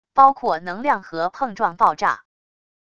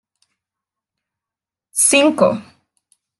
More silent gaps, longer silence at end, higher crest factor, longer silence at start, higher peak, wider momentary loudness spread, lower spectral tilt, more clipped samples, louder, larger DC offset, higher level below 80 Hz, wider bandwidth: neither; about the same, 0.75 s vs 0.8 s; about the same, 20 dB vs 20 dB; second, 0.15 s vs 1.75 s; about the same, 0 dBFS vs 0 dBFS; second, 9 LU vs 13 LU; first, -5 dB/octave vs -2.5 dB/octave; neither; second, -20 LUFS vs -14 LUFS; first, 0.4% vs under 0.1%; first, -60 dBFS vs -68 dBFS; second, 7.4 kHz vs 12.5 kHz